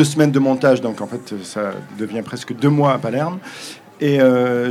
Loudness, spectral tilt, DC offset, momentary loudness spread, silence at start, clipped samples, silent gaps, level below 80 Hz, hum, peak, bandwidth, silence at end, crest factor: -18 LUFS; -6.5 dB/octave; under 0.1%; 14 LU; 0 s; under 0.1%; none; -68 dBFS; none; 0 dBFS; 14.5 kHz; 0 s; 18 dB